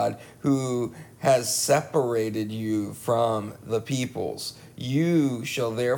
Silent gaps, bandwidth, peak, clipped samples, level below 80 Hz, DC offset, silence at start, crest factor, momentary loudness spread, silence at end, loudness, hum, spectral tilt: none; 19.5 kHz; -8 dBFS; under 0.1%; -64 dBFS; under 0.1%; 0 s; 18 dB; 9 LU; 0 s; -26 LUFS; none; -5 dB/octave